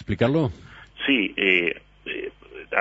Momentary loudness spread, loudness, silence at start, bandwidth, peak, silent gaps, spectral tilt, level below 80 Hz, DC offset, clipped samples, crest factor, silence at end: 17 LU; -23 LUFS; 0 s; 7.8 kHz; -4 dBFS; none; -7 dB/octave; -50 dBFS; under 0.1%; under 0.1%; 22 dB; 0 s